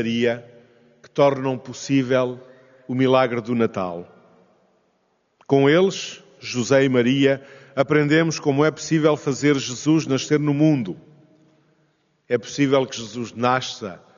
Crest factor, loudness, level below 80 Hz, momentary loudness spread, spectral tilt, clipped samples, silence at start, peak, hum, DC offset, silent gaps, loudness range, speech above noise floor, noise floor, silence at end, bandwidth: 18 dB; -21 LUFS; -66 dBFS; 13 LU; -5 dB/octave; under 0.1%; 0 s; -4 dBFS; none; under 0.1%; none; 4 LU; 47 dB; -67 dBFS; 0.2 s; 7.4 kHz